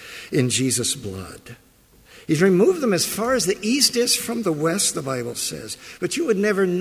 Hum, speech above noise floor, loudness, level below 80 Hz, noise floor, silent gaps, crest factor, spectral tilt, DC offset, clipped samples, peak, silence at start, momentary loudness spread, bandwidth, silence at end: none; 30 dB; -20 LUFS; -54 dBFS; -51 dBFS; none; 18 dB; -3.5 dB/octave; under 0.1%; under 0.1%; -4 dBFS; 0 s; 16 LU; 16 kHz; 0 s